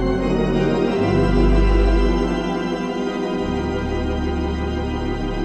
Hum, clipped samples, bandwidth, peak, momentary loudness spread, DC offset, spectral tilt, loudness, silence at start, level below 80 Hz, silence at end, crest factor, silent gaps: none; under 0.1%; 8.4 kHz; -6 dBFS; 7 LU; under 0.1%; -7.5 dB/octave; -20 LUFS; 0 s; -24 dBFS; 0 s; 12 dB; none